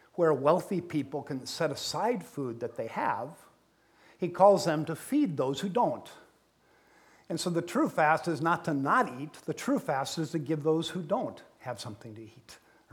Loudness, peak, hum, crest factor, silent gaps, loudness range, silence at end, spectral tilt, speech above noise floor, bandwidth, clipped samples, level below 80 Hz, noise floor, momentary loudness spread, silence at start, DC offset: -30 LUFS; -8 dBFS; none; 22 dB; none; 5 LU; 0.35 s; -5.5 dB/octave; 36 dB; 18.5 kHz; under 0.1%; -74 dBFS; -66 dBFS; 14 LU; 0.15 s; under 0.1%